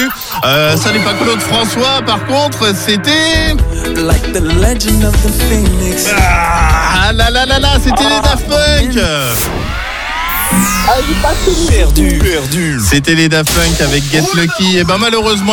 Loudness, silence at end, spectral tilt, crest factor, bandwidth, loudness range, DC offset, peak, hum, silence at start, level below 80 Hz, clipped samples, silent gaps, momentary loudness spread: -11 LUFS; 0 s; -4 dB/octave; 10 dB; 19 kHz; 2 LU; under 0.1%; 0 dBFS; none; 0 s; -16 dBFS; under 0.1%; none; 4 LU